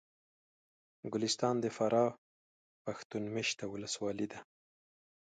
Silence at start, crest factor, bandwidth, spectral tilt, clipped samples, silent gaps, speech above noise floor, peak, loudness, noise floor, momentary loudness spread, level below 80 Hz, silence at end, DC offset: 1.05 s; 20 dB; 9.4 kHz; -4 dB/octave; under 0.1%; 2.18-2.85 s, 3.05-3.10 s; over 55 dB; -18 dBFS; -36 LUFS; under -90 dBFS; 13 LU; -76 dBFS; 0.85 s; under 0.1%